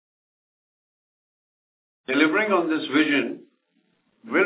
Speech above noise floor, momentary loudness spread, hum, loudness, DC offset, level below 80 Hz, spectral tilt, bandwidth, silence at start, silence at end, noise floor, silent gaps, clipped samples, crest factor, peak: 47 dB; 15 LU; none; -22 LUFS; under 0.1%; -84 dBFS; -2 dB/octave; 4 kHz; 2.1 s; 0 s; -69 dBFS; none; under 0.1%; 20 dB; -6 dBFS